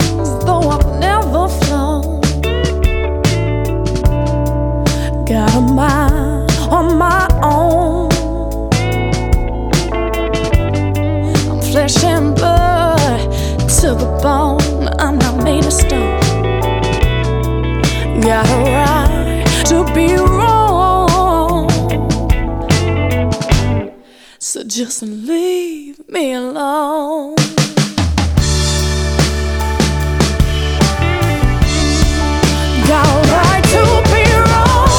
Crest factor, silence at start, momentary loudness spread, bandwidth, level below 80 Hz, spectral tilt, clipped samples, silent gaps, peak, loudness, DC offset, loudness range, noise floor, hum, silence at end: 12 dB; 0 s; 7 LU; over 20 kHz; -18 dBFS; -5 dB/octave; under 0.1%; none; 0 dBFS; -13 LUFS; under 0.1%; 5 LU; -41 dBFS; none; 0 s